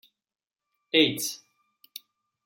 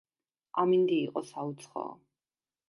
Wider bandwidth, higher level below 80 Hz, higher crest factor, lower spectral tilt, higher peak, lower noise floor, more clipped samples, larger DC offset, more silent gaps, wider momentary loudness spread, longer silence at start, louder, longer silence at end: first, 16.5 kHz vs 11.5 kHz; first, -78 dBFS vs -86 dBFS; first, 24 dB vs 18 dB; second, -2.5 dB/octave vs -6.5 dB/octave; first, -6 dBFS vs -14 dBFS; second, -69 dBFS vs under -90 dBFS; neither; neither; neither; first, 23 LU vs 14 LU; first, 0.95 s vs 0.55 s; first, -24 LUFS vs -31 LUFS; first, 1.1 s vs 0.75 s